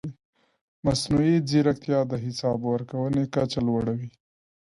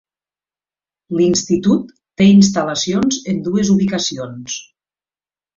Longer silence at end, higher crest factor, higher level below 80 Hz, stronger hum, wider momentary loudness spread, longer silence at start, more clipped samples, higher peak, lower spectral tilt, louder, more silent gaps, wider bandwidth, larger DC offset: second, 0.6 s vs 0.95 s; about the same, 16 dB vs 16 dB; about the same, -52 dBFS vs -52 dBFS; second, none vs 50 Hz at -25 dBFS; second, 8 LU vs 16 LU; second, 0.05 s vs 1.1 s; neither; second, -10 dBFS vs -2 dBFS; first, -6.5 dB/octave vs -5 dB/octave; second, -25 LUFS vs -15 LUFS; first, 0.25-0.33 s, 0.61-0.83 s vs none; first, 11.5 kHz vs 7.6 kHz; neither